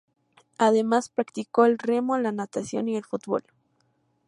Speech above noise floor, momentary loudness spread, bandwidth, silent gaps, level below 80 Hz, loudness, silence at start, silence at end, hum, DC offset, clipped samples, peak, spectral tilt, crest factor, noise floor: 45 dB; 10 LU; 11 kHz; none; -74 dBFS; -25 LUFS; 0.6 s; 0.9 s; none; under 0.1%; under 0.1%; -6 dBFS; -5.5 dB/octave; 20 dB; -69 dBFS